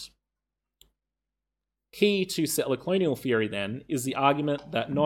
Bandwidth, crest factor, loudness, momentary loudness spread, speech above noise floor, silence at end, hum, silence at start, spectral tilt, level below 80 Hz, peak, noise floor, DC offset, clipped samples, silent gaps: 18 kHz; 22 dB; -27 LUFS; 7 LU; 61 dB; 0 s; none; 0 s; -4.5 dB/octave; -66 dBFS; -8 dBFS; -87 dBFS; under 0.1%; under 0.1%; none